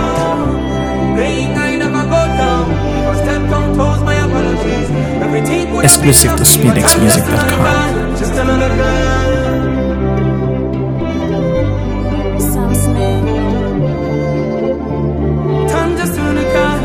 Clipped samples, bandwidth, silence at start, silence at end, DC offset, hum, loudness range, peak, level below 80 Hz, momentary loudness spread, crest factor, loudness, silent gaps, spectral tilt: 0.3%; over 20 kHz; 0 s; 0 s; under 0.1%; none; 6 LU; 0 dBFS; -22 dBFS; 9 LU; 12 dB; -13 LUFS; none; -4.5 dB/octave